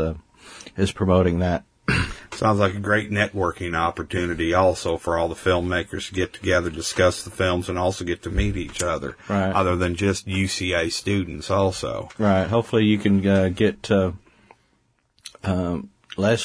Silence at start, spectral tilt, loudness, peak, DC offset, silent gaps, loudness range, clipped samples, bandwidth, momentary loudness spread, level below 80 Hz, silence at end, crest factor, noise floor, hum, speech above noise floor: 0 s; -5.5 dB/octave; -23 LUFS; -4 dBFS; under 0.1%; none; 2 LU; under 0.1%; 11 kHz; 9 LU; -40 dBFS; 0 s; 18 dB; -66 dBFS; none; 44 dB